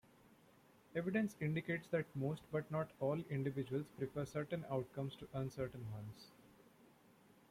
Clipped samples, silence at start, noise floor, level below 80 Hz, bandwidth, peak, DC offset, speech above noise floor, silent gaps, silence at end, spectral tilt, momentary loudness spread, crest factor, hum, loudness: under 0.1%; 0.9 s; -68 dBFS; -72 dBFS; 16 kHz; -26 dBFS; under 0.1%; 26 dB; none; 0.9 s; -7.5 dB/octave; 8 LU; 18 dB; none; -43 LUFS